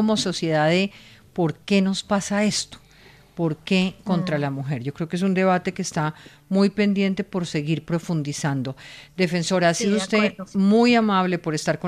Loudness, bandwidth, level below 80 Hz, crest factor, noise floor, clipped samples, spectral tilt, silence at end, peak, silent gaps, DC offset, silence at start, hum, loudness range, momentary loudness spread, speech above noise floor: -22 LUFS; 13.5 kHz; -58 dBFS; 18 dB; -51 dBFS; under 0.1%; -5.5 dB/octave; 0 s; -6 dBFS; none; under 0.1%; 0 s; none; 3 LU; 9 LU; 29 dB